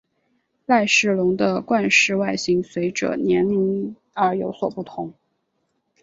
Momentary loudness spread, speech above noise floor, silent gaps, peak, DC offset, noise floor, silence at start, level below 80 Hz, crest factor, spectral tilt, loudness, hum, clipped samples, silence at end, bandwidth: 15 LU; 52 dB; none; -4 dBFS; under 0.1%; -72 dBFS; 0.7 s; -60 dBFS; 18 dB; -4.5 dB/octave; -20 LUFS; none; under 0.1%; 0.9 s; 8 kHz